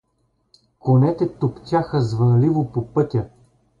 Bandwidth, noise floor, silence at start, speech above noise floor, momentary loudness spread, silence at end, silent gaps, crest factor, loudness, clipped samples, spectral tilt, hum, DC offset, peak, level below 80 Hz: 7.2 kHz; -67 dBFS; 0.85 s; 49 dB; 9 LU; 0.55 s; none; 14 dB; -20 LUFS; under 0.1%; -9.5 dB/octave; none; under 0.1%; -6 dBFS; -50 dBFS